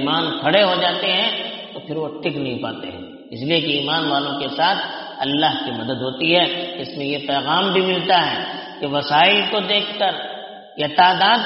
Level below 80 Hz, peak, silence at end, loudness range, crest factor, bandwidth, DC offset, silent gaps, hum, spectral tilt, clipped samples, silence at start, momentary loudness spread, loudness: -64 dBFS; 0 dBFS; 0 s; 4 LU; 18 dB; 5.8 kHz; under 0.1%; none; none; -1.5 dB/octave; under 0.1%; 0 s; 13 LU; -19 LUFS